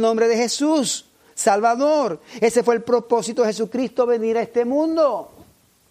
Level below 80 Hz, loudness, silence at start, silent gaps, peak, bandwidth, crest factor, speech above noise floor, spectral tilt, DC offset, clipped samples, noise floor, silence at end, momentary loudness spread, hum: -66 dBFS; -20 LUFS; 0 s; none; -4 dBFS; 15.5 kHz; 16 dB; 33 dB; -3.5 dB/octave; under 0.1%; under 0.1%; -52 dBFS; 0.65 s; 6 LU; none